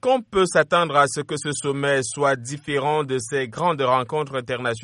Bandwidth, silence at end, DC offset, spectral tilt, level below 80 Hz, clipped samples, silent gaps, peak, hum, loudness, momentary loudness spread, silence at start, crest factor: 11.5 kHz; 0 s; under 0.1%; -4 dB/octave; -56 dBFS; under 0.1%; none; -4 dBFS; none; -22 LUFS; 8 LU; 0.05 s; 18 dB